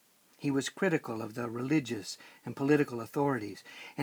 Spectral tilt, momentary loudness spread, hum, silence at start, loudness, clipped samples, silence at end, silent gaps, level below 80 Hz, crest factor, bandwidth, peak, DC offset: -5.5 dB/octave; 15 LU; none; 0.4 s; -32 LUFS; under 0.1%; 0 s; none; -76 dBFS; 18 dB; over 20 kHz; -14 dBFS; under 0.1%